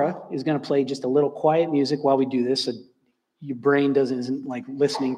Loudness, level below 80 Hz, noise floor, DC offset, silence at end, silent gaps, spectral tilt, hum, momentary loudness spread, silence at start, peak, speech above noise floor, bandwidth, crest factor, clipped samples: -23 LUFS; -76 dBFS; -65 dBFS; under 0.1%; 0 s; none; -6 dB/octave; none; 9 LU; 0 s; -6 dBFS; 43 dB; 11 kHz; 16 dB; under 0.1%